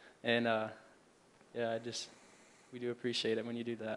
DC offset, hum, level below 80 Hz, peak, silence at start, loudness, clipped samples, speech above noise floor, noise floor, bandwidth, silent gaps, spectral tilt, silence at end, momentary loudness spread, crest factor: under 0.1%; none; -84 dBFS; -18 dBFS; 0 s; -38 LUFS; under 0.1%; 28 dB; -66 dBFS; 11.5 kHz; none; -4 dB/octave; 0 s; 16 LU; 20 dB